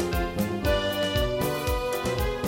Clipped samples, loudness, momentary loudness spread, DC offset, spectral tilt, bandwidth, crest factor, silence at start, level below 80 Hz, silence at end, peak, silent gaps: under 0.1%; -27 LUFS; 3 LU; under 0.1%; -5 dB/octave; 16.5 kHz; 14 dB; 0 s; -34 dBFS; 0 s; -12 dBFS; none